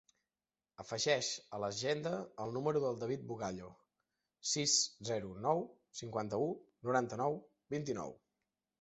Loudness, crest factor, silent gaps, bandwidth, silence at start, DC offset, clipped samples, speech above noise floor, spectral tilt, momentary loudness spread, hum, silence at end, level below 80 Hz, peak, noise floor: -38 LUFS; 22 dB; none; 8.2 kHz; 0.8 s; under 0.1%; under 0.1%; over 52 dB; -3 dB/octave; 12 LU; none; 0.65 s; -74 dBFS; -18 dBFS; under -90 dBFS